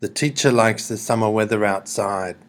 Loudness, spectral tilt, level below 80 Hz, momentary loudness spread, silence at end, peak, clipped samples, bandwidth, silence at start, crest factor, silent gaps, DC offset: -20 LUFS; -4.5 dB/octave; -68 dBFS; 7 LU; 0.15 s; 0 dBFS; under 0.1%; 19 kHz; 0 s; 20 dB; none; under 0.1%